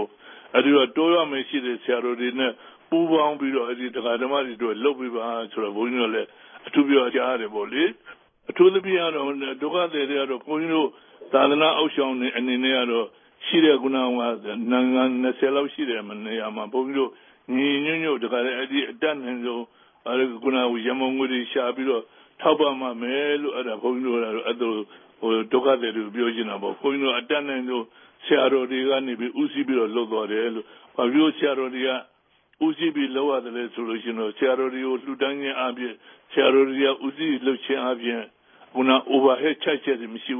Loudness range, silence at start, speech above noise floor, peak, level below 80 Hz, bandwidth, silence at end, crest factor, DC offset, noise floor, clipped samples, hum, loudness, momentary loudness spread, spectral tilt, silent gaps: 3 LU; 0 s; 40 dB; -4 dBFS; -82 dBFS; 3.7 kHz; 0 s; 20 dB; under 0.1%; -63 dBFS; under 0.1%; none; -23 LUFS; 10 LU; -9 dB/octave; none